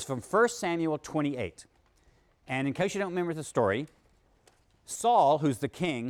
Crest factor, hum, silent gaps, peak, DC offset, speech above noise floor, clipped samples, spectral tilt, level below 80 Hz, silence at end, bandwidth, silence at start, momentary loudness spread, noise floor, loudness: 18 dB; none; none; -12 dBFS; under 0.1%; 37 dB; under 0.1%; -5 dB/octave; -64 dBFS; 0 s; 17 kHz; 0 s; 11 LU; -65 dBFS; -29 LUFS